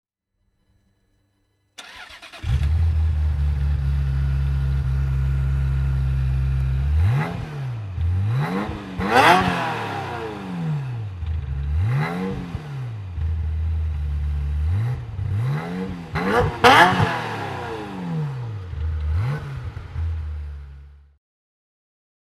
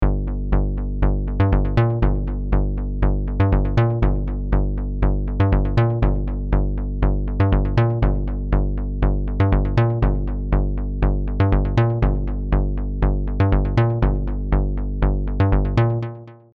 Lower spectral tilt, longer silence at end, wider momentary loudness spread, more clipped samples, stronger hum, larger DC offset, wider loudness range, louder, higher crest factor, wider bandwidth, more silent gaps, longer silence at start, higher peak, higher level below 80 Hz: second, -6 dB/octave vs -10 dB/octave; first, 1.4 s vs 0.2 s; first, 14 LU vs 6 LU; neither; second, none vs 50 Hz at -35 dBFS; neither; first, 9 LU vs 1 LU; about the same, -23 LUFS vs -21 LUFS; first, 22 dB vs 14 dB; first, 13.5 kHz vs 4.8 kHz; neither; first, 1.8 s vs 0 s; first, 0 dBFS vs -4 dBFS; second, -28 dBFS vs -22 dBFS